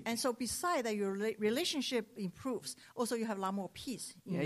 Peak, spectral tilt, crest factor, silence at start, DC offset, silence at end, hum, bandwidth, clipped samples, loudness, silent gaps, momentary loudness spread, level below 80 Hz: -22 dBFS; -4 dB/octave; 14 dB; 0 s; under 0.1%; 0 s; none; 15.5 kHz; under 0.1%; -37 LUFS; none; 9 LU; -70 dBFS